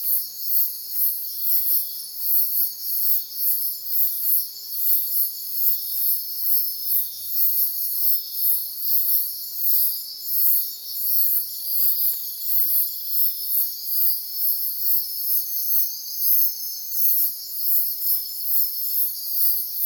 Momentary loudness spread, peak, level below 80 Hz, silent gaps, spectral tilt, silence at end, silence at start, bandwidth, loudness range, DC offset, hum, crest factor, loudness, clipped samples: 5 LU; -4 dBFS; -78 dBFS; none; 3 dB/octave; 0 s; 0 s; 19.5 kHz; 1 LU; under 0.1%; none; 18 dB; -19 LUFS; under 0.1%